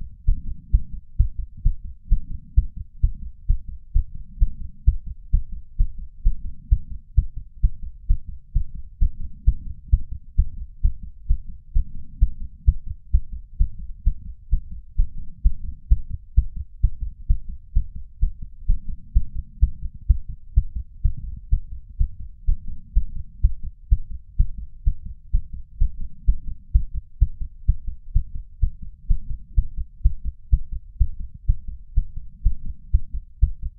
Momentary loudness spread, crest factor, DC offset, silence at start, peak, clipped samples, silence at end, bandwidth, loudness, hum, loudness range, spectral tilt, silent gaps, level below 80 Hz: 10 LU; 20 dB; under 0.1%; 0 s; -2 dBFS; under 0.1%; 0.1 s; 0.3 kHz; -28 LUFS; none; 2 LU; -17 dB/octave; none; -24 dBFS